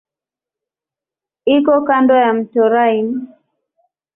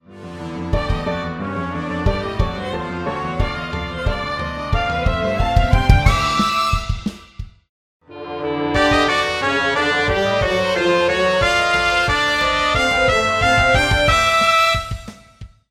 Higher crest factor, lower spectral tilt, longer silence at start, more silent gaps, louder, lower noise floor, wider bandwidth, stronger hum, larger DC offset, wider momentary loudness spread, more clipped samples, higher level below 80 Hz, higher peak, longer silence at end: about the same, 14 dB vs 18 dB; first, -9.5 dB/octave vs -4.5 dB/octave; first, 1.45 s vs 0.1 s; second, none vs 7.69-8.00 s; first, -14 LUFS vs -17 LUFS; first, -88 dBFS vs -40 dBFS; second, 3.9 kHz vs 15.5 kHz; neither; neither; about the same, 10 LU vs 11 LU; neither; second, -62 dBFS vs -26 dBFS; about the same, -2 dBFS vs 0 dBFS; first, 0.9 s vs 0.25 s